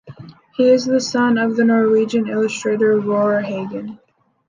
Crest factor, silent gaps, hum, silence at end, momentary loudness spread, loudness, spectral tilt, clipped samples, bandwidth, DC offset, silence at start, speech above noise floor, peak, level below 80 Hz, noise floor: 14 dB; none; none; 0.55 s; 12 LU; -17 LUFS; -5.5 dB/octave; under 0.1%; 9.6 kHz; under 0.1%; 0.05 s; 23 dB; -4 dBFS; -64 dBFS; -39 dBFS